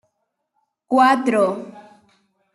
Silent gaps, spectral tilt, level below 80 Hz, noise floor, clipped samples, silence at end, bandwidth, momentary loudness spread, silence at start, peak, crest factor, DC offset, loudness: none; -5 dB/octave; -70 dBFS; -74 dBFS; under 0.1%; 0.75 s; 12 kHz; 17 LU; 0.9 s; -4 dBFS; 18 dB; under 0.1%; -17 LUFS